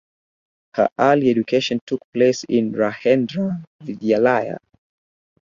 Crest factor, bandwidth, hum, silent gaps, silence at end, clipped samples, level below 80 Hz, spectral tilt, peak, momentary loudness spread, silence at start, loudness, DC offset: 18 dB; 7.4 kHz; none; 0.92-0.96 s, 1.81-1.87 s, 2.04-2.13 s, 3.67-3.79 s; 0.85 s; under 0.1%; -62 dBFS; -6 dB/octave; -2 dBFS; 13 LU; 0.75 s; -19 LUFS; under 0.1%